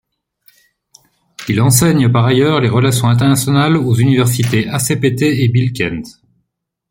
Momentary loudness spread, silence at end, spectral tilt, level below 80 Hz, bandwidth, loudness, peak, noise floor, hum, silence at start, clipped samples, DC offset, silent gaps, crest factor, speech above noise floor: 8 LU; 0.8 s; -5.5 dB/octave; -46 dBFS; 16.5 kHz; -13 LUFS; 0 dBFS; -72 dBFS; none; 1.4 s; under 0.1%; under 0.1%; none; 14 dB; 60 dB